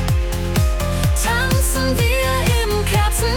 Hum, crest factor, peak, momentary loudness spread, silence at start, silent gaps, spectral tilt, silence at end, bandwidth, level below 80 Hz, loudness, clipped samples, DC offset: none; 10 dB; -6 dBFS; 3 LU; 0 s; none; -4.5 dB/octave; 0 s; 18 kHz; -22 dBFS; -18 LUFS; under 0.1%; under 0.1%